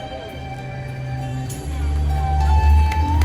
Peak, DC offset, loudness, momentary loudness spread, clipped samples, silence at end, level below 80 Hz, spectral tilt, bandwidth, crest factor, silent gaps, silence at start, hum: -6 dBFS; under 0.1%; -21 LUFS; 15 LU; under 0.1%; 0 s; -22 dBFS; -6.5 dB/octave; 12 kHz; 12 dB; none; 0 s; none